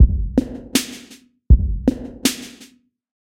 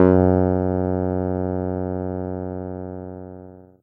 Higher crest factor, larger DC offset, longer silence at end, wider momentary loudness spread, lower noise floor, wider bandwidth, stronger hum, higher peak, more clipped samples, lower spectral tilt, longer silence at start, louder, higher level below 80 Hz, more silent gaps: about the same, 18 dB vs 20 dB; neither; first, 0.85 s vs 0.2 s; about the same, 16 LU vs 18 LU; first, -50 dBFS vs -42 dBFS; first, 16 kHz vs 3.1 kHz; second, none vs 60 Hz at -65 dBFS; about the same, 0 dBFS vs 0 dBFS; neither; second, -5 dB/octave vs -13 dB/octave; about the same, 0 s vs 0 s; first, -20 LUFS vs -23 LUFS; first, -22 dBFS vs -46 dBFS; neither